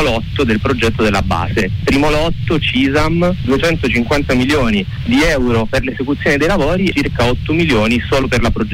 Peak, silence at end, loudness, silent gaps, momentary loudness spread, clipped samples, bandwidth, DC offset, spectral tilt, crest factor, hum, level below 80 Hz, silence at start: -4 dBFS; 0 s; -14 LUFS; none; 3 LU; under 0.1%; 16.5 kHz; under 0.1%; -6 dB/octave; 10 dB; none; -26 dBFS; 0 s